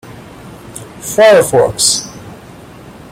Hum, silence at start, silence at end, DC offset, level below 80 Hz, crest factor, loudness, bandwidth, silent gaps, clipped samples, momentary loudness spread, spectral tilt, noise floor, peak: none; 0.05 s; 0.2 s; under 0.1%; -46 dBFS; 14 dB; -10 LUFS; 16.5 kHz; none; under 0.1%; 26 LU; -2.5 dB/octave; -34 dBFS; 0 dBFS